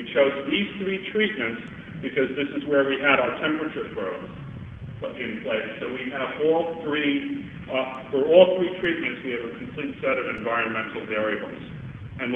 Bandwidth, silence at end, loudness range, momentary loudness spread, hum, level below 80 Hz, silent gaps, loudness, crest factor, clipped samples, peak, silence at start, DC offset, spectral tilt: 3.9 kHz; 0 s; 5 LU; 16 LU; none; -56 dBFS; none; -25 LUFS; 22 dB; under 0.1%; -2 dBFS; 0 s; under 0.1%; -7.5 dB/octave